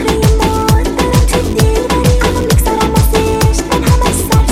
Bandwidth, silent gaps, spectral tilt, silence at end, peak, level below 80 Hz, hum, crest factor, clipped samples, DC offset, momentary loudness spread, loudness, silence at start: 17 kHz; none; -5.5 dB/octave; 0 s; 0 dBFS; -16 dBFS; none; 10 dB; under 0.1%; 0.4%; 1 LU; -12 LUFS; 0 s